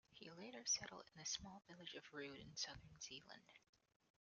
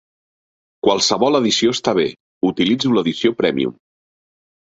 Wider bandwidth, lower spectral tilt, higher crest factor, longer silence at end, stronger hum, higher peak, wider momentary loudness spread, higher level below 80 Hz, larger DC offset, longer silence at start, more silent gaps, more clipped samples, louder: first, 10.5 kHz vs 8 kHz; second, -1 dB/octave vs -4 dB/octave; about the same, 22 dB vs 18 dB; second, 0.6 s vs 1.05 s; neither; second, -32 dBFS vs -2 dBFS; first, 16 LU vs 7 LU; second, -78 dBFS vs -58 dBFS; neither; second, 0.1 s vs 0.85 s; second, none vs 2.20-2.41 s; neither; second, -50 LUFS vs -17 LUFS